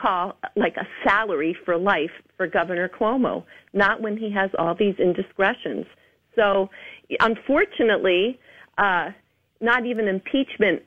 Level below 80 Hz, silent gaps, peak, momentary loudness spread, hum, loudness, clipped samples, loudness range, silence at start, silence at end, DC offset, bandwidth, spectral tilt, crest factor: -56 dBFS; none; -6 dBFS; 10 LU; none; -22 LUFS; under 0.1%; 2 LU; 0 s; 0.1 s; under 0.1%; 8 kHz; -7 dB/octave; 18 dB